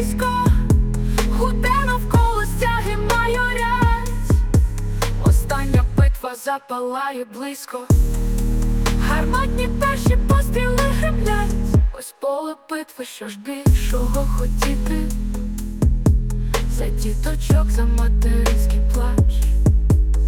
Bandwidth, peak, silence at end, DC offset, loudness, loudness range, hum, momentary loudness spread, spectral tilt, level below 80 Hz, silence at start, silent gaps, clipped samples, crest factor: 17.5 kHz; -6 dBFS; 0 s; under 0.1%; -20 LUFS; 3 LU; none; 9 LU; -6 dB/octave; -20 dBFS; 0 s; none; under 0.1%; 12 dB